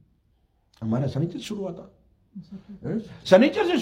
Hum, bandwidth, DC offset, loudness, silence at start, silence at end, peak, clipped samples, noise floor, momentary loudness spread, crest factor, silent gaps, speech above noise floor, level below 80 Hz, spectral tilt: none; 13 kHz; under 0.1%; -24 LUFS; 0.8 s; 0 s; -2 dBFS; under 0.1%; -66 dBFS; 25 LU; 24 dB; none; 42 dB; -60 dBFS; -6.5 dB/octave